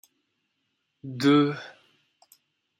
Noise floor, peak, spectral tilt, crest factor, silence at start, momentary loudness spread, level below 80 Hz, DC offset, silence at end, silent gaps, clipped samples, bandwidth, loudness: -77 dBFS; -10 dBFS; -6.5 dB/octave; 18 dB; 1.05 s; 24 LU; -74 dBFS; under 0.1%; 1.1 s; none; under 0.1%; 15 kHz; -23 LUFS